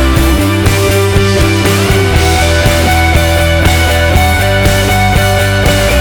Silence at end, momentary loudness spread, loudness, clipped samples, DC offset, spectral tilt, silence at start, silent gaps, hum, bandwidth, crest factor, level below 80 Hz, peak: 0 s; 1 LU; -9 LUFS; under 0.1%; under 0.1%; -4.5 dB/octave; 0 s; none; none; over 20 kHz; 8 dB; -16 dBFS; 0 dBFS